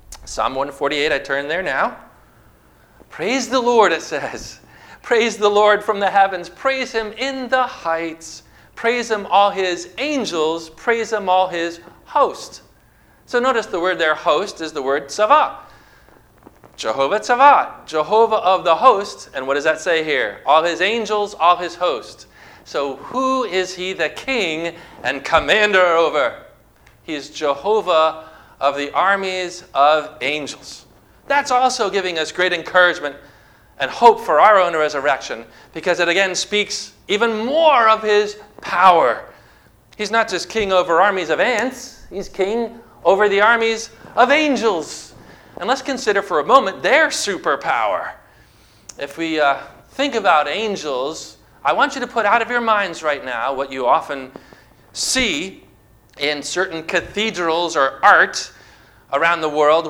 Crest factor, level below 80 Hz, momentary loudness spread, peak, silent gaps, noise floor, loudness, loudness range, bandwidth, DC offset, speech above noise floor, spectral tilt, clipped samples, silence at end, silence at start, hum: 18 dB; -52 dBFS; 14 LU; 0 dBFS; none; -52 dBFS; -17 LUFS; 5 LU; 16.5 kHz; under 0.1%; 34 dB; -2.5 dB/octave; under 0.1%; 0 s; 0.1 s; none